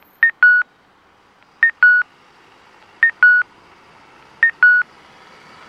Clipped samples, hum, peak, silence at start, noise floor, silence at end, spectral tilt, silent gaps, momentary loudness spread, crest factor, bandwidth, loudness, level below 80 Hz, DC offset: under 0.1%; none; -2 dBFS; 0.2 s; -53 dBFS; 0.85 s; -1.5 dB/octave; none; 16 LU; 16 dB; 5.8 kHz; -13 LUFS; -70 dBFS; under 0.1%